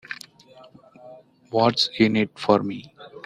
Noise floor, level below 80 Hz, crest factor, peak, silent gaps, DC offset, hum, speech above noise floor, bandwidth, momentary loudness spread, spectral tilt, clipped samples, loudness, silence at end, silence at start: -50 dBFS; -62 dBFS; 22 dB; -2 dBFS; none; under 0.1%; none; 29 dB; 11.5 kHz; 18 LU; -5.5 dB/octave; under 0.1%; -21 LUFS; 0.05 s; 0.1 s